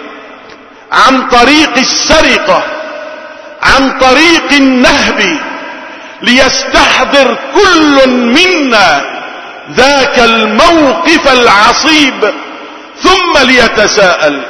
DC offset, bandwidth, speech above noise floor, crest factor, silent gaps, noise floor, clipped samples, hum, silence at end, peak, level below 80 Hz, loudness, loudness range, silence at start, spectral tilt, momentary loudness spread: under 0.1%; 11 kHz; 26 dB; 8 dB; none; -32 dBFS; 3%; none; 0 s; 0 dBFS; -30 dBFS; -6 LUFS; 2 LU; 0 s; -2.5 dB/octave; 17 LU